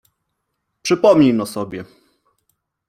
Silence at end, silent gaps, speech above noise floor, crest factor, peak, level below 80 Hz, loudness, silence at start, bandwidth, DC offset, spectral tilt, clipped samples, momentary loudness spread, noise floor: 1.05 s; none; 59 dB; 18 dB; -2 dBFS; -58 dBFS; -16 LUFS; 0.85 s; 16 kHz; under 0.1%; -6 dB/octave; under 0.1%; 17 LU; -74 dBFS